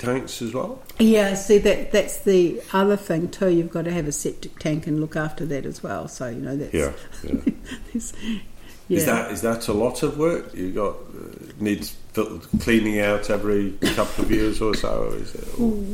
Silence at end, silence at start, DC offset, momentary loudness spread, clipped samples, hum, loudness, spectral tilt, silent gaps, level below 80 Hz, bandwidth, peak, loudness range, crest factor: 0 s; 0 s; under 0.1%; 12 LU; under 0.1%; none; -23 LUFS; -5 dB/octave; none; -36 dBFS; 16.5 kHz; -6 dBFS; 7 LU; 18 dB